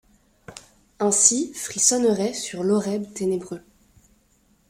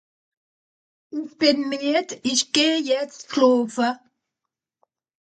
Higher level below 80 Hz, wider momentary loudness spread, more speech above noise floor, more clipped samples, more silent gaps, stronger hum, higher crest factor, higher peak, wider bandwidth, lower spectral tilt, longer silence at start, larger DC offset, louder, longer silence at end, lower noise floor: first, -62 dBFS vs -76 dBFS; about the same, 12 LU vs 14 LU; second, 40 dB vs 64 dB; neither; neither; neither; about the same, 24 dB vs 20 dB; first, 0 dBFS vs -4 dBFS; first, 16 kHz vs 9.4 kHz; about the same, -3 dB/octave vs -2 dB/octave; second, 0.5 s vs 1.15 s; neither; about the same, -21 LUFS vs -21 LUFS; second, 1.1 s vs 1.35 s; second, -62 dBFS vs -85 dBFS